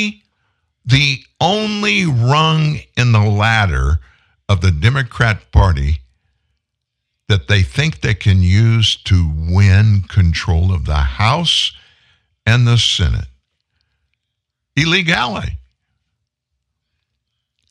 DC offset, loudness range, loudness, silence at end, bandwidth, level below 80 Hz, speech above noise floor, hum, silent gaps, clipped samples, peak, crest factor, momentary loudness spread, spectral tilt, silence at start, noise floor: under 0.1%; 6 LU; -14 LUFS; 2.1 s; 10 kHz; -26 dBFS; 63 dB; none; none; under 0.1%; 0 dBFS; 16 dB; 9 LU; -5 dB/octave; 0 s; -76 dBFS